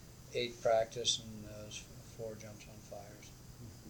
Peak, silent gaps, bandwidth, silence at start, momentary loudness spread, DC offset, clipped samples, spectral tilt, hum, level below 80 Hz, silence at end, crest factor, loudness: -20 dBFS; none; 19 kHz; 0 s; 20 LU; under 0.1%; under 0.1%; -2.5 dB/octave; none; -62 dBFS; 0 s; 22 dB; -38 LUFS